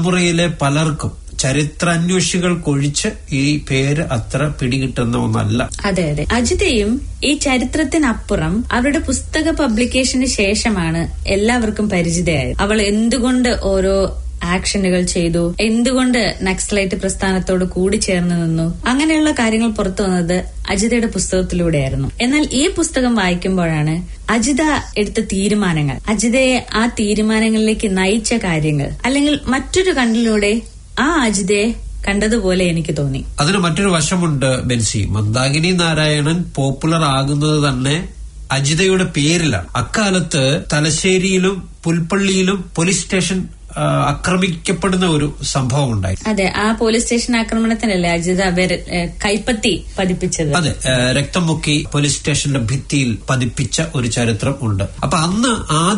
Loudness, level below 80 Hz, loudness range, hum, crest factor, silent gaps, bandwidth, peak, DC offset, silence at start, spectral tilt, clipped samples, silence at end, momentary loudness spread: -16 LUFS; -30 dBFS; 1 LU; none; 14 dB; none; 11 kHz; -2 dBFS; under 0.1%; 0 s; -4.5 dB/octave; under 0.1%; 0 s; 5 LU